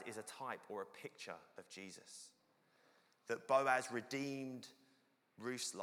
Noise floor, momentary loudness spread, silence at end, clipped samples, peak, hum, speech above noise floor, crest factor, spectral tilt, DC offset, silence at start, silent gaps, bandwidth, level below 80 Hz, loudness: -76 dBFS; 20 LU; 0 s; under 0.1%; -20 dBFS; none; 33 dB; 24 dB; -3.5 dB/octave; under 0.1%; 0 s; none; 19 kHz; under -90 dBFS; -43 LUFS